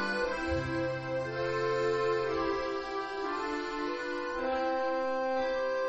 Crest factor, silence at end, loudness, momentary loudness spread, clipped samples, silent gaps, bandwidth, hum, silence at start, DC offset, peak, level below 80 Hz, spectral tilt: 12 dB; 0 s; -32 LUFS; 5 LU; under 0.1%; none; 8.4 kHz; none; 0 s; under 0.1%; -20 dBFS; -54 dBFS; -5.5 dB/octave